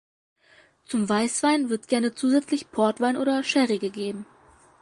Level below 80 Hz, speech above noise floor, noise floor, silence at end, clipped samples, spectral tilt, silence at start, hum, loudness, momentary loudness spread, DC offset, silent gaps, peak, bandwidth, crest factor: -70 dBFS; 34 dB; -58 dBFS; 0.55 s; under 0.1%; -4 dB/octave; 0.9 s; none; -24 LUFS; 8 LU; under 0.1%; none; -8 dBFS; 11.5 kHz; 16 dB